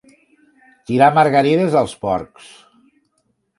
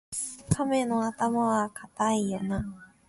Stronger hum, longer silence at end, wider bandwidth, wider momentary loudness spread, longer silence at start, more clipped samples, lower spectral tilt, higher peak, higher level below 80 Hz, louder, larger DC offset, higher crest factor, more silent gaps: neither; first, 1.35 s vs 0.25 s; about the same, 11.5 kHz vs 12 kHz; first, 11 LU vs 8 LU; first, 0.9 s vs 0.1 s; neither; about the same, -6.5 dB/octave vs -5.5 dB/octave; first, 0 dBFS vs -8 dBFS; about the same, -54 dBFS vs -50 dBFS; first, -15 LUFS vs -28 LUFS; neither; about the same, 18 dB vs 20 dB; neither